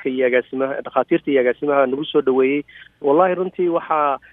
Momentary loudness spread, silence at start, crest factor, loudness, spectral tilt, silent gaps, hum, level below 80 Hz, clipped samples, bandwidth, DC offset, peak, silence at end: 6 LU; 0 s; 16 dB; -19 LUFS; -9.5 dB/octave; none; none; -64 dBFS; under 0.1%; 3.9 kHz; under 0.1%; -2 dBFS; 0.15 s